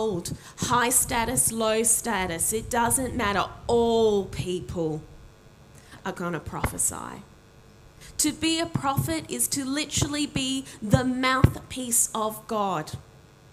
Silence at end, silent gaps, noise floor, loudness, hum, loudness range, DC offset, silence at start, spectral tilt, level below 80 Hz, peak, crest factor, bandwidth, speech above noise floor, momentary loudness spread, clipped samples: 0.5 s; none; -52 dBFS; -25 LUFS; none; 8 LU; under 0.1%; 0 s; -3.5 dB/octave; -46 dBFS; -2 dBFS; 26 dB; 16 kHz; 26 dB; 11 LU; under 0.1%